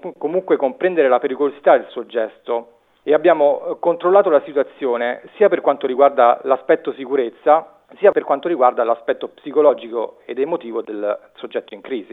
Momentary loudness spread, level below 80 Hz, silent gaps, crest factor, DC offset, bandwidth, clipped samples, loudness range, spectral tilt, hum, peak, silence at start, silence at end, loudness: 11 LU; -74 dBFS; none; 18 dB; under 0.1%; 4 kHz; under 0.1%; 3 LU; -8 dB/octave; none; 0 dBFS; 0.05 s; 0.1 s; -18 LUFS